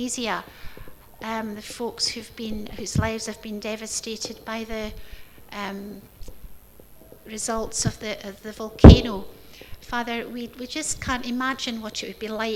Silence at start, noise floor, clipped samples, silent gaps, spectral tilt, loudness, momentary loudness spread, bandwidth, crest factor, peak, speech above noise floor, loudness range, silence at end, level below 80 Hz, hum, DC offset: 0 s; -49 dBFS; under 0.1%; none; -5.5 dB/octave; -23 LUFS; 12 LU; 15.5 kHz; 24 dB; 0 dBFS; 26 dB; 14 LU; 0 s; -30 dBFS; none; under 0.1%